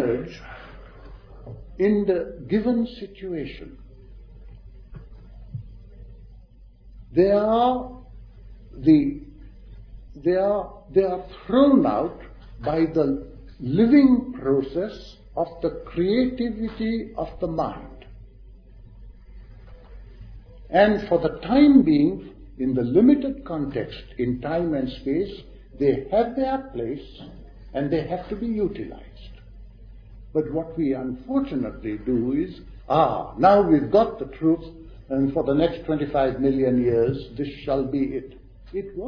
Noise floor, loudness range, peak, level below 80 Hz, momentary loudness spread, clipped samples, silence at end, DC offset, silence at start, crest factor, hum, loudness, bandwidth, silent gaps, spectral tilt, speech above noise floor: -48 dBFS; 9 LU; -4 dBFS; -44 dBFS; 19 LU; under 0.1%; 0 s; under 0.1%; 0 s; 20 dB; none; -23 LUFS; 5.4 kHz; none; -9.5 dB/octave; 26 dB